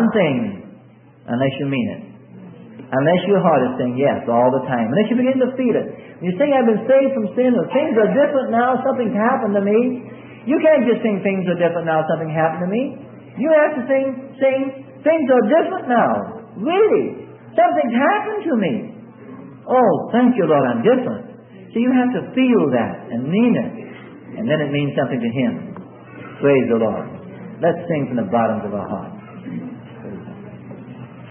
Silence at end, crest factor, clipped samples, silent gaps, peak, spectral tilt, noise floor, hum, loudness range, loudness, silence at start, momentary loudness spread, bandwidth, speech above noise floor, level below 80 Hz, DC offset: 0 s; 16 dB; under 0.1%; none; -2 dBFS; -12 dB/octave; -46 dBFS; none; 4 LU; -18 LUFS; 0 s; 20 LU; 3.6 kHz; 29 dB; -64 dBFS; under 0.1%